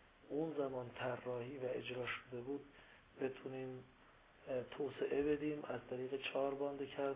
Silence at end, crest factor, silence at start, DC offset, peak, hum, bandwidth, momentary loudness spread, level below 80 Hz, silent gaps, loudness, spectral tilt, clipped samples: 0 s; 16 dB; 0 s; under 0.1%; -28 dBFS; none; 3.9 kHz; 11 LU; -72 dBFS; none; -44 LUFS; -4.5 dB/octave; under 0.1%